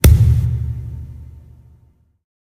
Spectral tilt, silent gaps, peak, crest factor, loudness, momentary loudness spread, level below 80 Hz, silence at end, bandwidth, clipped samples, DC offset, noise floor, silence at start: -6 dB/octave; none; 0 dBFS; 16 dB; -16 LUFS; 25 LU; -22 dBFS; 1.25 s; 15.5 kHz; under 0.1%; under 0.1%; -54 dBFS; 0.05 s